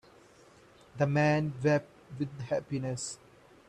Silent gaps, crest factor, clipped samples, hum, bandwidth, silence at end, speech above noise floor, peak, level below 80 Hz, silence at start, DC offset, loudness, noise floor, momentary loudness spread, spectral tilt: none; 18 dB; under 0.1%; none; 11 kHz; 0.55 s; 28 dB; -14 dBFS; -66 dBFS; 0.95 s; under 0.1%; -31 LUFS; -58 dBFS; 17 LU; -6 dB/octave